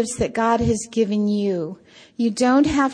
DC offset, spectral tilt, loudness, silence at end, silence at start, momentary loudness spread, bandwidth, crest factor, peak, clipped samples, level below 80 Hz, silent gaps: under 0.1%; -5.5 dB/octave; -20 LUFS; 0 s; 0 s; 9 LU; 10.5 kHz; 14 dB; -6 dBFS; under 0.1%; -44 dBFS; none